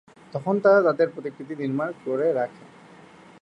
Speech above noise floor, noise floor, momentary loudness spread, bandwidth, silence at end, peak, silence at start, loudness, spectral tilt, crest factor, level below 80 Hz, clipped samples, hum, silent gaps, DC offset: 26 dB; -49 dBFS; 15 LU; 9 kHz; 0.75 s; -6 dBFS; 0.35 s; -23 LUFS; -8 dB/octave; 18 dB; -74 dBFS; under 0.1%; none; none; under 0.1%